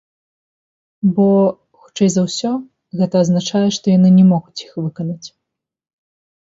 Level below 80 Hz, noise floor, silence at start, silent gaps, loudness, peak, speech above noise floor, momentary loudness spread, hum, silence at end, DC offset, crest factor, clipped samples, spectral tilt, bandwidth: -60 dBFS; -80 dBFS; 1.05 s; none; -15 LUFS; -2 dBFS; 66 dB; 15 LU; none; 1.2 s; under 0.1%; 14 dB; under 0.1%; -7 dB/octave; 7.8 kHz